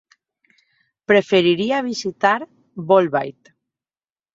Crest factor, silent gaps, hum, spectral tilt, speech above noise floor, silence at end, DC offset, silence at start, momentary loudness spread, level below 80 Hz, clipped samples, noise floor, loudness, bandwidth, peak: 18 dB; none; none; -5 dB/octave; over 72 dB; 1.05 s; under 0.1%; 1.1 s; 18 LU; -66 dBFS; under 0.1%; under -90 dBFS; -18 LUFS; 7.8 kHz; -2 dBFS